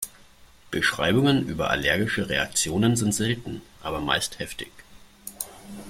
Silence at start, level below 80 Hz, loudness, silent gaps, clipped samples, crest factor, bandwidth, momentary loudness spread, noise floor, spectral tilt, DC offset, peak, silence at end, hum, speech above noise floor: 0 s; -48 dBFS; -24 LUFS; none; under 0.1%; 20 dB; 16.5 kHz; 15 LU; -52 dBFS; -4 dB/octave; under 0.1%; -6 dBFS; 0 s; none; 27 dB